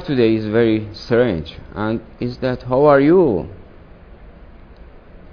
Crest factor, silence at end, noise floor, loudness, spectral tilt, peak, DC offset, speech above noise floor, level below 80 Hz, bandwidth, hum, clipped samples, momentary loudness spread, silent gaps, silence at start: 18 dB; 0.15 s; -41 dBFS; -17 LUFS; -9 dB/octave; 0 dBFS; under 0.1%; 25 dB; -40 dBFS; 5.4 kHz; none; under 0.1%; 14 LU; none; 0 s